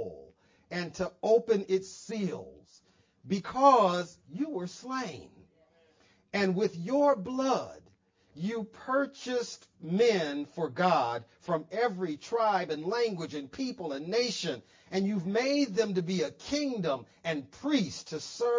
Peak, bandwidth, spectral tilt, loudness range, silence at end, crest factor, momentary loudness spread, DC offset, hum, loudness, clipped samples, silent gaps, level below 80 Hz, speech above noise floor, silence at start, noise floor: -10 dBFS; 7.6 kHz; -5 dB/octave; 3 LU; 0 s; 22 dB; 12 LU; under 0.1%; none; -31 LUFS; under 0.1%; none; -68 dBFS; 35 dB; 0 s; -66 dBFS